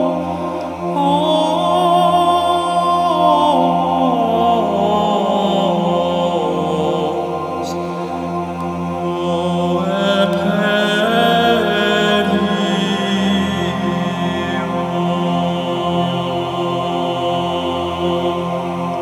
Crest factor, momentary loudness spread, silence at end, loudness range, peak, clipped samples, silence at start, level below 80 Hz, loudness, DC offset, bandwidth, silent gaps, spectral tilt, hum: 14 dB; 8 LU; 0 s; 5 LU; -2 dBFS; under 0.1%; 0 s; -50 dBFS; -17 LUFS; under 0.1%; 14.5 kHz; none; -6 dB/octave; none